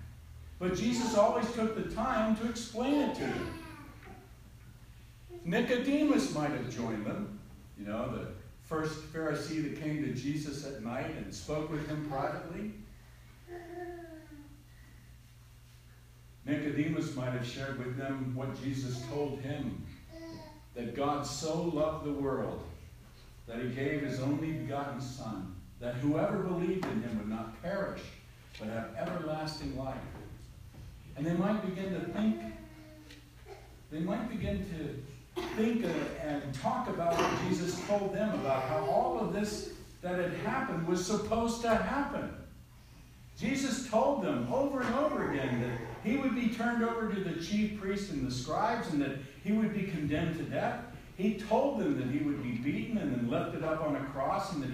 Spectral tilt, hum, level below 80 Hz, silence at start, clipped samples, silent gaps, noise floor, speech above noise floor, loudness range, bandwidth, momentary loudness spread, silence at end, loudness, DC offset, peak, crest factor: -6 dB/octave; none; -54 dBFS; 0 s; under 0.1%; none; -56 dBFS; 22 dB; 7 LU; 15.5 kHz; 18 LU; 0 s; -34 LUFS; under 0.1%; -14 dBFS; 20 dB